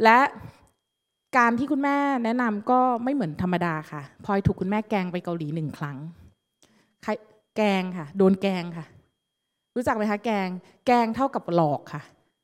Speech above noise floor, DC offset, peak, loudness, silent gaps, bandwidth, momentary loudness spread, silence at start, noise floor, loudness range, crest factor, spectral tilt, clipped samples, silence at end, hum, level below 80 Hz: 57 dB; under 0.1%; -2 dBFS; -25 LUFS; none; 14 kHz; 14 LU; 0 s; -81 dBFS; 6 LU; 24 dB; -7 dB/octave; under 0.1%; 0.4 s; none; -56 dBFS